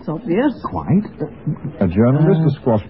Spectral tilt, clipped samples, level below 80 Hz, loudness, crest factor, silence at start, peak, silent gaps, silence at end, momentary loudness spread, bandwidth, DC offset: -14 dB/octave; under 0.1%; -44 dBFS; -18 LUFS; 14 dB; 0 s; -2 dBFS; none; 0 s; 12 LU; 5.6 kHz; 0.4%